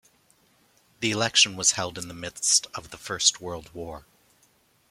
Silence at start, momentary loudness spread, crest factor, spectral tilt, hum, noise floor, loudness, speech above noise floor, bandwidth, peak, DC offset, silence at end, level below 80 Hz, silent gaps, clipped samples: 1 s; 19 LU; 24 dB; -1 dB/octave; none; -64 dBFS; -23 LUFS; 37 dB; 16.5 kHz; -4 dBFS; under 0.1%; 0.9 s; -60 dBFS; none; under 0.1%